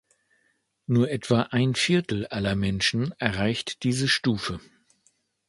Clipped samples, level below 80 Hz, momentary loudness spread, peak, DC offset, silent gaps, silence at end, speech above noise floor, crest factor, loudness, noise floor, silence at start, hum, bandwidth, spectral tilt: under 0.1%; -50 dBFS; 7 LU; -2 dBFS; under 0.1%; none; 0.9 s; 46 dB; 24 dB; -25 LUFS; -71 dBFS; 0.9 s; none; 11.5 kHz; -5 dB/octave